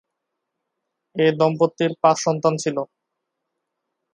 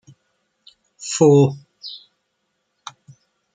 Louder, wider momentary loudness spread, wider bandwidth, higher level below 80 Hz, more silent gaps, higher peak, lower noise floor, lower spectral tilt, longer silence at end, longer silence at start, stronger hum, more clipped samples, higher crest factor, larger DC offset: second, -20 LUFS vs -16 LUFS; second, 11 LU vs 26 LU; first, 11 kHz vs 9.4 kHz; second, -72 dBFS vs -66 dBFS; neither; about the same, -2 dBFS vs -2 dBFS; first, -80 dBFS vs -72 dBFS; about the same, -5.5 dB/octave vs -6 dB/octave; second, 1.3 s vs 1.6 s; first, 1.15 s vs 1 s; neither; neither; about the same, 22 dB vs 20 dB; neither